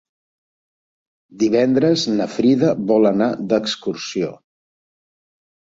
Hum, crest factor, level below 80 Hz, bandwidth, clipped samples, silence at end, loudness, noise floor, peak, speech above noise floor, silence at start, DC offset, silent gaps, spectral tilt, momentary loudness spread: none; 18 dB; -60 dBFS; 7.8 kHz; under 0.1%; 1.4 s; -18 LUFS; under -90 dBFS; -2 dBFS; over 73 dB; 1.35 s; under 0.1%; none; -5.5 dB/octave; 9 LU